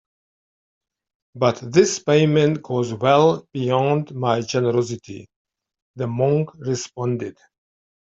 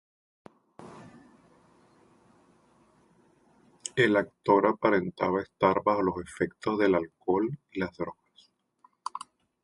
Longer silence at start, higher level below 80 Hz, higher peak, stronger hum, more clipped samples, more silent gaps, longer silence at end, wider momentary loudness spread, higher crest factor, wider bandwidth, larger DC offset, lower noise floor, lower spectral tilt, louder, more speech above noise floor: first, 1.35 s vs 0.8 s; about the same, -60 dBFS vs -62 dBFS; first, -2 dBFS vs -8 dBFS; neither; neither; first, 5.36-5.45 s, 5.82-5.94 s vs none; first, 0.8 s vs 0.45 s; second, 12 LU vs 19 LU; about the same, 20 dB vs 24 dB; second, 7.8 kHz vs 11.5 kHz; neither; first, under -90 dBFS vs -66 dBFS; about the same, -6 dB/octave vs -6 dB/octave; first, -20 LUFS vs -28 LUFS; first, over 70 dB vs 39 dB